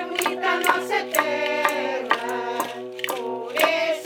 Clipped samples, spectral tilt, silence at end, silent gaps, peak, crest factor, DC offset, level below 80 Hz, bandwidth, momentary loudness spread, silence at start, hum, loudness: under 0.1%; -1.5 dB/octave; 0 s; none; -2 dBFS; 22 dB; under 0.1%; -80 dBFS; 19.5 kHz; 8 LU; 0 s; none; -23 LUFS